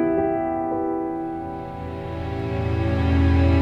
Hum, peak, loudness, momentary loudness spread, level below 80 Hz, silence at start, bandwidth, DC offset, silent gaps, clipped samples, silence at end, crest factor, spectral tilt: none; -8 dBFS; -24 LUFS; 13 LU; -30 dBFS; 0 s; 5.6 kHz; under 0.1%; none; under 0.1%; 0 s; 14 dB; -9.5 dB/octave